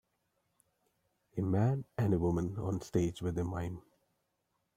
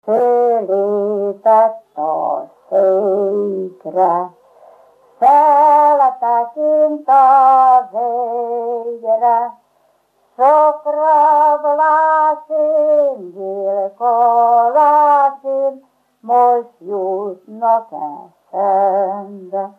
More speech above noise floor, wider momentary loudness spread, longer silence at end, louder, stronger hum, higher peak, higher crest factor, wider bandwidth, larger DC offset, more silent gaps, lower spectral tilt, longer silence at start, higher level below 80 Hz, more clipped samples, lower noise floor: about the same, 48 dB vs 45 dB; about the same, 10 LU vs 12 LU; first, 0.95 s vs 0.1 s; second, -35 LUFS vs -14 LUFS; second, none vs 50 Hz at -80 dBFS; second, -18 dBFS vs -2 dBFS; first, 18 dB vs 12 dB; first, 15 kHz vs 4.9 kHz; neither; neither; about the same, -8 dB/octave vs -7.5 dB/octave; first, 1.35 s vs 0.05 s; first, -58 dBFS vs -82 dBFS; neither; first, -82 dBFS vs -58 dBFS